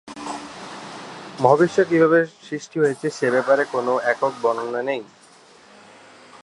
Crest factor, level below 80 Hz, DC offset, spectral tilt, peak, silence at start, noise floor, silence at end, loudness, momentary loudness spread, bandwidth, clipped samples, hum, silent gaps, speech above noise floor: 20 dB; -70 dBFS; under 0.1%; -5.5 dB/octave; -2 dBFS; 0.05 s; -50 dBFS; 1.4 s; -20 LUFS; 19 LU; 11.5 kHz; under 0.1%; none; none; 30 dB